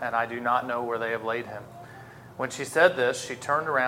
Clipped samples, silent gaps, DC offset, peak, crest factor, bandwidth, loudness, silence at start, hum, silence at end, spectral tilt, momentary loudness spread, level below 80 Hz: under 0.1%; none; under 0.1%; -4 dBFS; 22 dB; 16.5 kHz; -27 LUFS; 0 s; none; 0 s; -3.5 dB/octave; 23 LU; -68 dBFS